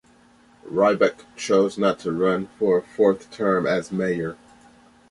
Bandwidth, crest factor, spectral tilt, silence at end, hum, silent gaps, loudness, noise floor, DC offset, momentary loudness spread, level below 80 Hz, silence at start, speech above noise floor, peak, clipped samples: 11.5 kHz; 20 dB; -6 dB/octave; 0.75 s; none; none; -22 LUFS; -55 dBFS; under 0.1%; 7 LU; -60 dBFS; 0.65 s; 33 dB; -4 dBFS; under 0.1%